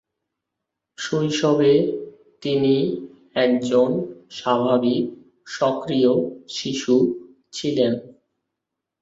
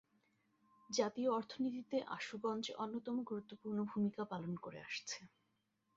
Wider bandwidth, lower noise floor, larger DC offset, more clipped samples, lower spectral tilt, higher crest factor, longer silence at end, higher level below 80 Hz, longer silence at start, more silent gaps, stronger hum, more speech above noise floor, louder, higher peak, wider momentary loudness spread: about the same, 8 kHz vs 7.6 kHz; about the same, -83 dBFS vs -83 dBFS; neither; neither; about the same, -5.5 dB/octave vs -4.5 dB/octave; about the same, 16 dB vs 20 dB; first, 0.9 s vs 0.7 s; first, -64 dBFS vs -84 dBFS; about the same, 1 s vs 0.9 s; neither; neither; first, 63 dB vs 41 dB; first, -21 LUFS vs -42 LUFS; first, -6 dBFS vs -22 dBFS; first, 14 LU vs 8 LU